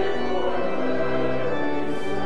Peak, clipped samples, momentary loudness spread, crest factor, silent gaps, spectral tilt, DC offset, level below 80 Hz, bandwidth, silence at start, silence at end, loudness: -10 dBFS; under 0.1%; 2 LU; 12 dB; none; -6.5 dB/octave; 7%; -48 dBFS; 11.5 kHz; 0 s; 0 s; -26 LUFS